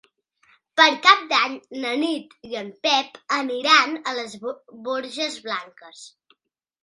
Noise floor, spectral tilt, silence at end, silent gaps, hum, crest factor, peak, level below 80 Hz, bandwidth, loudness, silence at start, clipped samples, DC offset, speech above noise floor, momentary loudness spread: -70 dBFS; -1 dB/octave; 0.75 s; none; none; 24 dB; 0 dBFS; -76 dBFS; 11.5 kHz; -21 LUFS; 0.75 s; under 0.1%; under 0.1%; 48 dB; 17 LU